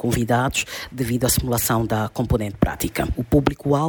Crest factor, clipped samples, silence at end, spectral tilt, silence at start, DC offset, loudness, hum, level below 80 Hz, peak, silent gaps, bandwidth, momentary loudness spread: 18 dB; under 0.1%; 0 s; -5 dB/octave; 0 s; under 0.1%; -21 LUFS; none; -34 dBFS; -4 dBFS; none; over 20 kHz; 5 LU